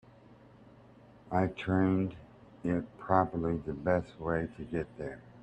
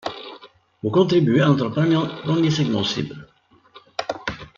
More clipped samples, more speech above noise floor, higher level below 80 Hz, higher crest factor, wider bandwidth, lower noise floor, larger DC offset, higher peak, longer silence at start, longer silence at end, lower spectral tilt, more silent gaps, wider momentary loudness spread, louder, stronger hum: neither; second, 25 dB vs 32 dB; about the same, -58 dBFS vs -56 dBFS; first, 24 dB vs 18 dB; first, 8.4 kHz vs 7.2 kHz; first, -57 dBFS vs -50 dBFS; neither; second, -10 dBFS vs -4 dBFS; first, 0.3 s vs 0.05 s; about the same, 0 s vs 0.1 s; first, -9 dB/octave vs -6.5 dB/octave; neither; second, 11 LU vs 16 LU; second, -33 LUFS vs -20 LUFS; neither